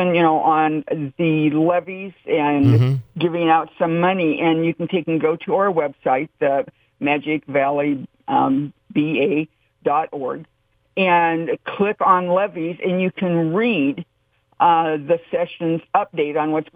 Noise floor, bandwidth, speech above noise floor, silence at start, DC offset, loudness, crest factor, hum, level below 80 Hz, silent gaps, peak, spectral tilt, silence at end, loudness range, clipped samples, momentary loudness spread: -63 dBFS; 5.8 kHz; 44 dB; 0 s; under 0.1%; -19 LUFS; 16 dB; none; -60 dBFS; none; -2 dBFS; -9 dB/octave; 0.15 s; 3 LU; under 0.1%; 9 LU